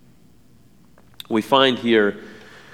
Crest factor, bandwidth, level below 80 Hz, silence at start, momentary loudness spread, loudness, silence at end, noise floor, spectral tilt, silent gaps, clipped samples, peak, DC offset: 20 dB; 16 kHz; -62 dBFS; 1.3 s; 24 LU; -18 LUFS; 0.45 s; -54 dBFS; -5 dB/octave; none; under 0.1%; -2 dBFS; 0.3%